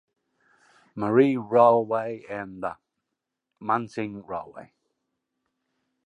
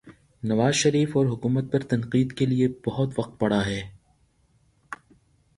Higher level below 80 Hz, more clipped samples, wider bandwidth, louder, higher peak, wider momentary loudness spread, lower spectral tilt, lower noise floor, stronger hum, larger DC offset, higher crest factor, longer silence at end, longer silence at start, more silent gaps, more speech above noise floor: second, -68 dBFS vs -54 dBFS; neither; second, 10 kHz vs 11.5 kHz; about the same, -24 LUFS vs -24 LUFS; first, -4 dBFS vs -8 dBFS; second, 17 LU vs 20 LU; first, -8 dB/octave vs -5.5 dB/octave; first, -84 dBFS vs -64 dBFS; neither; neither; about the same, 22 dB vs 18 dB; first, 1.45 s vs 0.6 s; first, 0.95 s vs 0.05 s; neither; first, 60 dB vs 40 dB